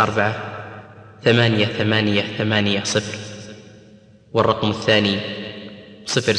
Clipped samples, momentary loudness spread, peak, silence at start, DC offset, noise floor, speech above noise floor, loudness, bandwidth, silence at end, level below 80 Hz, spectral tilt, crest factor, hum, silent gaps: under 0.1%; 19 LU; -2 dBFS; 0 s; under 0.1%; -48 dBFS; 29 dB; -19 LUFS; 10.5 kHz; 0 s; -56 dBFS; -4.5 dB/octave; 18 dB; none; none